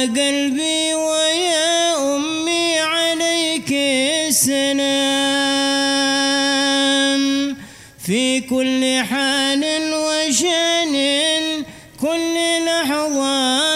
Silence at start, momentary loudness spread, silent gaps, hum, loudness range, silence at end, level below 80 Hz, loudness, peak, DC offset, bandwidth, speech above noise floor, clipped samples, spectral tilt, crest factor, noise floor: 0 s; 4 LU; none; none; 2 LU; 0 s; -58 dBFS; -17 LUFS; -4 dBFS; under 0.1%; 16 kHz; 20 dB; under 0.1%; -1.5 dB/octave; 14 dB; -38 dBFS